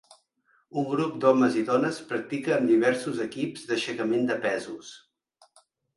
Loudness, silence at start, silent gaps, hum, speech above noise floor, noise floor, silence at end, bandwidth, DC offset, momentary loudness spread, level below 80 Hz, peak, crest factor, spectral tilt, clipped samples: -26 LUFS; 0.75 s; none; none; 43 dB; -68 dBFS; 1 s; 11.5 kHz; under 0.1%; 11 LU; -72 dBFS; -8 dBFS; 20 dB; -5.5 dB/octave; under 0.1%